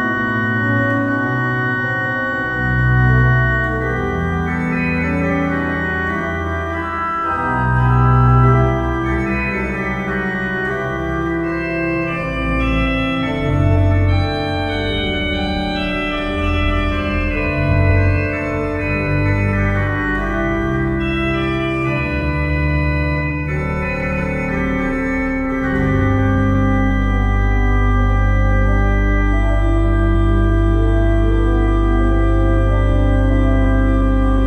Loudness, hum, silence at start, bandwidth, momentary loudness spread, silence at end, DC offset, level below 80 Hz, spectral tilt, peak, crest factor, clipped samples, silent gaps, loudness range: -17 LUFS; none; 0 s; 7 kHz; 5 LU; 0 s; under 0.1%; -20 dBFS; -8 dB/octave; 0 dBFS; 14 dB; under 0.1%; none; 3 LU